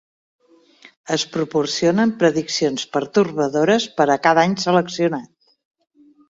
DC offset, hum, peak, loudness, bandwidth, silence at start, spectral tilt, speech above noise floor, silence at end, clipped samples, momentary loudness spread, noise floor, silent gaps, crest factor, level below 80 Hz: under 0.1%; none; -2 dBFS; -19 LUFS; 7.8 kHz; 0.85 s; -4.5 dB/octave; 32 dB; 1.05 s; under 0.1%; 6 LU; -50 dBFS; 0.97-1.04 s; 18 dB; -62 dBFS